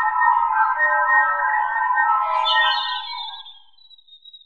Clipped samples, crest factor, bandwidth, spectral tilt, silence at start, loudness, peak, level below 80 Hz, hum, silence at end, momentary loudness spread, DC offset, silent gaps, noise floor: under 0.1%; 16 dB; 7.4 kHz; 2 dB/octave; 0 s; -18 LUFS; -6 dBFS; -60 dBFS; none; 0.1 s; 12 LU; under 0.1%; none; -51 dBFS